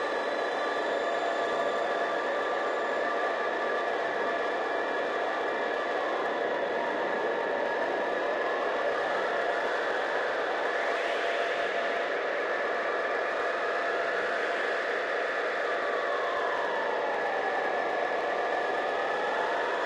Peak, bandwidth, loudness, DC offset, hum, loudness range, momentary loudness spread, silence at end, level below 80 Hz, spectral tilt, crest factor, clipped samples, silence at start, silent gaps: -16 dBFS; 11.5 kHz; -29 LUFS; under 0.1%; none; 1 LU; 1 LU; 0 s; -72 dBFS; -3 dB/octave; 14 dB; under 0.1%; 0 s; none